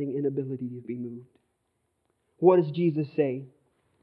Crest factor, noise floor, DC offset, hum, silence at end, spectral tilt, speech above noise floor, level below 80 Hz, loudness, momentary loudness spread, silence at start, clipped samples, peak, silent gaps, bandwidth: 22 dB; -76 dBFS; under 0.1%; none; 0.55 s; -11.5 dB/octave; 50 dB; -80 dBFS; -27 LUFS; 16 LU; 0 s; under 0.1%; -8 dBFS; none; 4.7 kHz